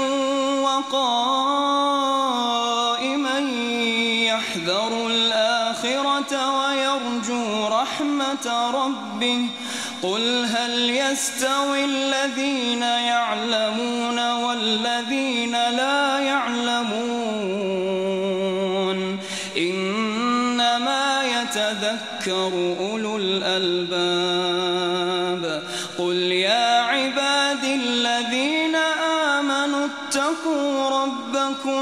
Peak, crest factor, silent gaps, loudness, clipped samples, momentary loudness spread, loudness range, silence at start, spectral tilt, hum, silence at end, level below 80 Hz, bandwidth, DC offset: -8 dBFS; 14 dB; none; -21 LUFS; under 0.1%; 5 LU; 2 LU; 0 s; -3 dB/octave; none; 0 s; -72 dBFS; 15 kHz; under 0.1%